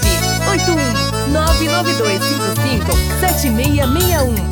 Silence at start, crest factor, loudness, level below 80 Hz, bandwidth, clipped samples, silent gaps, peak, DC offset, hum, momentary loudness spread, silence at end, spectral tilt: 0 s; 14 dB; -15 LUFS; -22 dBFS; over 20 kHz; under 0.1%; none; -2 dBFS; under 0.1%; none; 2 LU; 0 s; -4.5 dB/octave